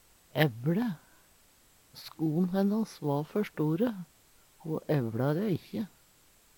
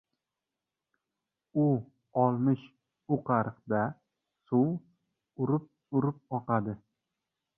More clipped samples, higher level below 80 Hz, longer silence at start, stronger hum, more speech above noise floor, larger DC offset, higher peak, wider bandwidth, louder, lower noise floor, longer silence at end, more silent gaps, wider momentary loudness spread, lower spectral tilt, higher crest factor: neither; about the same, -68 dBFS vs -70 dBFS; second, 0.35 s vs 1.55 s; neither; second, 32 dB vs 60 dB; neither; about the same, -10 dBFS vs -12 dBFS; first, 19 kHz vs 3.5 kHz; about the same, -31 LUFS vs -31 LUFS; second, -63 dBFS vs -89 dBFS; about the same, 0.7 s vs 0.8 s; neither; first, 17 LU vs 8 LU; second, -7.5 dB/octave vs -12.5 dB/octave; about the same, 22 dB vs 20 dB